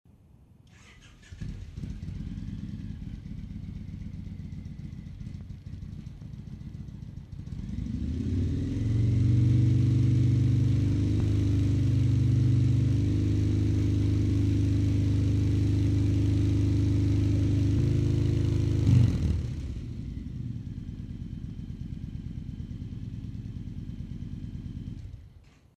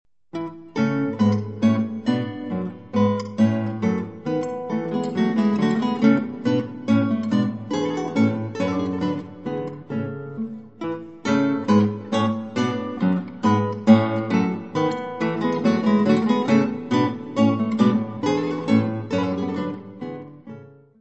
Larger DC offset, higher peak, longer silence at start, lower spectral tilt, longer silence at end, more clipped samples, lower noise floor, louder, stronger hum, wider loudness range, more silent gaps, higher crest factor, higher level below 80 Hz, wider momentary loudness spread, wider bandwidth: second, under 0.1% vs 0.2%; second, -10 dBFS vs 0 dBFS; first, 1.05 s vs 0.35 s; about the same, -8.5 dB/octave vs -7.5 dB/octave; first, 0.5 s vs 0.35 s; neither; first, -56 dBFS vs -42 dBFS; second, -27 LUFS vs -22 LUFS; neither; first, 16 LU vs 4 LU; neither; about the same, 18 dB vs 22 dB; first, -38 dBFS vs -66 dBFS; first, 17 LU vs 12 LU; about the same, 8.4 kHz vs 8.2 kHz